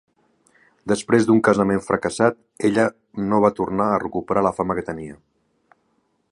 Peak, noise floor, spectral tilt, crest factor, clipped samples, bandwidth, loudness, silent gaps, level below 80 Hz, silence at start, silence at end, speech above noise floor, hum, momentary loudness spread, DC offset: -2 dBFS; -67 dBFS; -6.5 dB/octave; 20 dB; under 0.1%; 11.5 kHz; -20 LUFS; none; -52 dBFS; 0.85 s; 1.15 s; 47 dB; none; 11 LU; under 0.1%